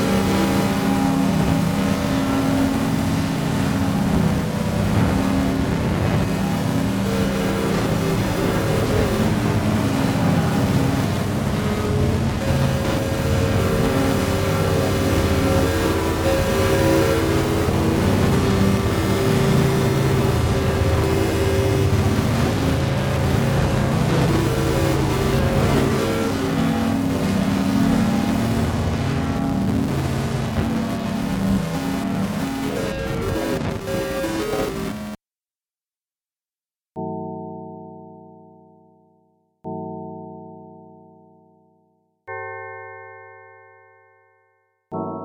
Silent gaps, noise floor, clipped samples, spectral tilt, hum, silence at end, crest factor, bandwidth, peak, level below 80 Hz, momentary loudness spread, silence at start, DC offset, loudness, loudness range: none; under -90 dBFS; under 0.1%; -6 dB/octave; none; 0 s; 16 dB; over 20 kHz; -4 dBFS; -34 dBFS; 11 LU; 0 s; under 0.1%; -20 LUFS; 18 LU